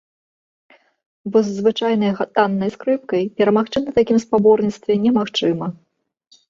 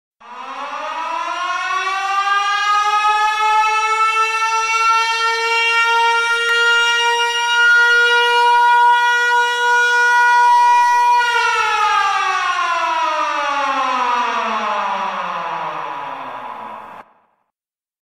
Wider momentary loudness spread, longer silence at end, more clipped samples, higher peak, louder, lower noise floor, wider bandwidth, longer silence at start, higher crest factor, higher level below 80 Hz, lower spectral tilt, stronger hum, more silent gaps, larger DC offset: second, 7 LU vs 13 LU; second, 0.8 s vs 1.05 s; neither; first, -2 dBFS vs -6 dBFS; second, -18 LUFS vs -14 LUFS; second, -57 dBFS vs under -90 dBFS; second, 7.6 kHz vs 15 kHz; first, 1.25 s vs 0.25 s; first, 16 dB vs 10 dB; first, -56 dBFS vs -62 dBFS; first, -6.5 dB/octave vs 0.5 dB/octave; neither; neither; neither